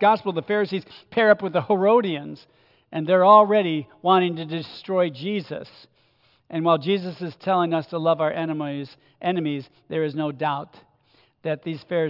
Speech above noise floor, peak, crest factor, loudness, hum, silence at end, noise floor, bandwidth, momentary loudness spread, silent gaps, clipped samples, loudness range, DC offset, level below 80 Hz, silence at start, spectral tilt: 40 dB; -2 dBFS; 20 dB; -22 LUFS; none; 0 s; -62 dBFS; 5.8 kHz; 14 LU; none; under 0.1%; 7 LU; under 0.1%; -74 dBFS; 0 s; -8.5 dB/octave